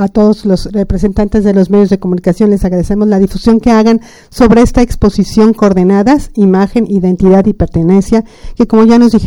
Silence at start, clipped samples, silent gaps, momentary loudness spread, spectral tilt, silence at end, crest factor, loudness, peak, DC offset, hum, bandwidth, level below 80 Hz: 0 s; 1%; none; 6 LU; -7.5 dB/octave; 0 s; 8 dB; -9 LUFS; 0 dBFS; under 0.1%; none; 12 kHz; -24 dBFS